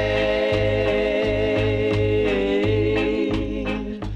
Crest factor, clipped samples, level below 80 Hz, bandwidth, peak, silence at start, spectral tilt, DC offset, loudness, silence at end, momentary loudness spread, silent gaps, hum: 12 dB; under 0.1%; -34 dBFS; 8.8 kHz; -8 dBFS; 0 s; -7 dB/octave; under 0.1%; -21 LUFS; 0 s; 5 LU; none; none